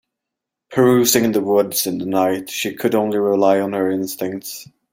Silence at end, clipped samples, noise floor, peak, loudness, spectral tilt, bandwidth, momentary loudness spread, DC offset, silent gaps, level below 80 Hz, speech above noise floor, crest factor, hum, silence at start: 0.3 s; under 0.1%; -83 dBFS; 0 dBFS; -18 LUFS; -4 dB/octave; 16.5 kHz; 11 LU; under 0.1%; none; -60 dBFS; 65 dB; 18 dB; none; 0.7 s